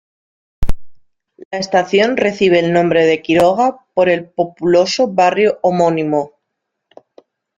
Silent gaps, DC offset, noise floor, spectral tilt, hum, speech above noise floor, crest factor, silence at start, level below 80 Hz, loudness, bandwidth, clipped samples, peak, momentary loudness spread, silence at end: 1.45-1.51 s; under 0.1%; -75 dBFS; -5.5 dB/octave; none; 62 dB; 16 dB; 0.6 s; -34 dBFS; -14 LUFS; 11 kHz; under 0.1%; 0 dBFS; 14 LU; 1.3 s